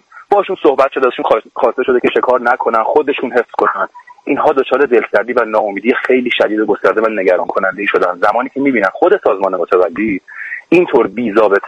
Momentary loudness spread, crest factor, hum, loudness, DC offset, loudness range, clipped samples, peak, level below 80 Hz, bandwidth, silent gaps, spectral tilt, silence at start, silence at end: 4 LU; 14 dB; none; -13 LUFS; under 0.1%; 1 LU; under 0.1%; 0 dBFS; -56 dBFS; 8.4 kHz; none; -6.5 dB/octave; 0.15 s; 0 s